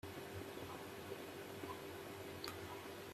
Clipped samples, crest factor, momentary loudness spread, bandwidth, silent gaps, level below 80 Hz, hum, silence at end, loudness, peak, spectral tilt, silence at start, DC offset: under 0.1%; 22 dB; 2 LU; 15.5 kHz; none; -76 dBFS; none; 0 s; -50 LUFS; -28 dBFS; -4.5 dB/octave; 0.05 s; under 0.1%